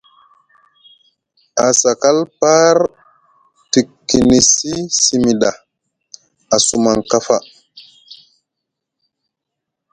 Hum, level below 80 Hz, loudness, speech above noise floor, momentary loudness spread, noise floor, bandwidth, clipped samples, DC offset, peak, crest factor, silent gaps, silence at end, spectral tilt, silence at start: none; -46 dBFS; -13 LUFS; 66 dB; 8 LU; -79 dBFS; 11 kHz; under 0.1%; under 0.1%; 0 dBFS; 16 dB; none; 2.15 s; -3 dB/octave; 1.55 s